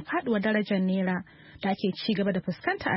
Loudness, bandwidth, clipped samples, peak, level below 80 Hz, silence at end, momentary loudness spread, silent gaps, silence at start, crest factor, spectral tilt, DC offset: -28 LUFS; 5.8 kHz; under 0.1%; -12 dBFS; -62 dBFS; 0 s; 7 LU; none; 0 s; 16 dB; -10.5 dB/octave; under 0.1%